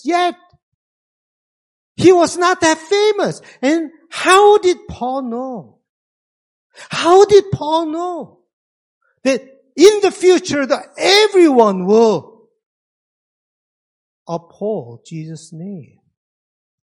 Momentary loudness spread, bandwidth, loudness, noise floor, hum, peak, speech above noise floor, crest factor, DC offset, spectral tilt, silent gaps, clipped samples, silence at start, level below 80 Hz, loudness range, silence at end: 20 LU; 11.5 kHz; -14 LUFS; under -90 dBFS; none; 0 dBFS; over 76 dB; 16 dB; under 0.1%; -4 dB/octave; 0.63-1.95 s, 5.89-6.70 s, 8.53-9.01 s, 12.66-14.26 s; 0.2%; 0.05 s; -56 dBFS; 17 LU; 1 s